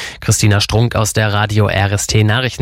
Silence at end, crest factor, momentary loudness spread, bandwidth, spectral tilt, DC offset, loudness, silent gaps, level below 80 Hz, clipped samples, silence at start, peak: 0 s; 14 dB; 2 LU; 16.5 kHz; -4.5 dB/octave; under 0.1%; -14 LUFS; none; -34 dBFS; under 0.1%; 0 s; 0 dBFS